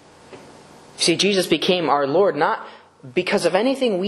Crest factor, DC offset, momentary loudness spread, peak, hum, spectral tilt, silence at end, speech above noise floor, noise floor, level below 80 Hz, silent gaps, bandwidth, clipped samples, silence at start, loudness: 18 dB; under 0.1%; 5 LU; -4 dBFS; none; -4 dB/octave; 0 s; 26 dB; -45 dBFS; -64 dBFS; none; 12.5 kHz; under 0.1%; 0.3 s; -19 LUFS